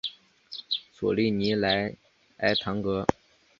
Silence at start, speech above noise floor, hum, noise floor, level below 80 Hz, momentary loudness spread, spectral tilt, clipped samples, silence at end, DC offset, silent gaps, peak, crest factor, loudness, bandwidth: 0.05 s; 21 dB; none; -47 dBFS; -56 dBFS; 10 LU; -6 dB/octave; under 0.1%; 0.5 s; under 0.1%; none; -2 dBFS; 26 dB; -27 LUFS; 7.4 kHz